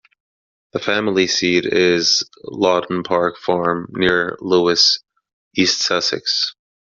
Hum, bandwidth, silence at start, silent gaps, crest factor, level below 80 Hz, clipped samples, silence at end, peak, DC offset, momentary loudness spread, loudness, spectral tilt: none; 7.4 kHz; 0.75 s; 5.33-5.51 s; 16 dB; -56 dBFS; under 0.1%; 0.35 s; -2 dBFS; under 0.1%; 8 LU; -17 LUFS; -2 dB/octave